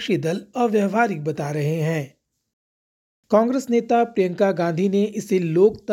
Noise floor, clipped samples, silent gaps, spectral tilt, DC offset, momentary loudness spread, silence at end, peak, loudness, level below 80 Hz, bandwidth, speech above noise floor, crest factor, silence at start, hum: under -90 dBFS; under 0.1%; 2.53-3.23 s; -7 dB/octave; under 0.1%; 7 LU; 0 s; -4 dBFS; -21 LUFS; -64 dBFS; 16.5 kHz; over 70 dB; 18 dB; 0 s; none